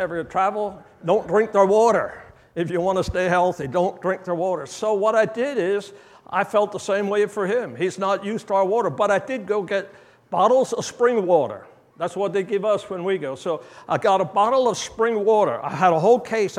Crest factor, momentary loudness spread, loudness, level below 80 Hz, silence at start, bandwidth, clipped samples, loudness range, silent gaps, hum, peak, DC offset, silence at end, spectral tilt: 18 dB; 10 LU; -21 LUFS; -54 dBFS; 0 s; 12.5 kHz; under 0.1%; 3 LU; none; none; -4 dBFS; under 0.1%; 0 s; -5 dB/octave